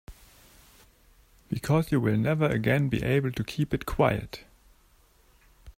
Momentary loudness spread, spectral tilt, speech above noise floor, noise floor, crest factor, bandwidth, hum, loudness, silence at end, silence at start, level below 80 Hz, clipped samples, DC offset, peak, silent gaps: 10 LU; -7 dB/octave; 35 dB; -61 dBFS; 20 dB; 16 kHz; none; -27 LUFS; 0.05 s; 0.1 s; -48 dBFS; under 0.1%; under 0.1%; -8 dBFS; none